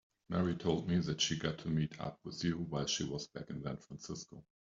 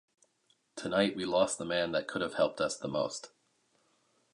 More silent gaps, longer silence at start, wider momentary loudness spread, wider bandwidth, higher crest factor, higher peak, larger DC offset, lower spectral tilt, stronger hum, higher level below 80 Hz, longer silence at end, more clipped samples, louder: neither; second, 0.3 s vs 0.75 s; first, 12 LU vs 9 LU; second, 7.8 kHz vs 11.5 kHz; about the same, 18 dB vs 20 dB; second, -20 dBFS vs -14 dBFS; neither; first, -5 dB/octave vs -3.5 dB/octave; neither; first, -62 dBFS vs -68 dBFS; second, 0.3 s vs 1.05 s; neither; second, -38 LUFS vs -32 LUFS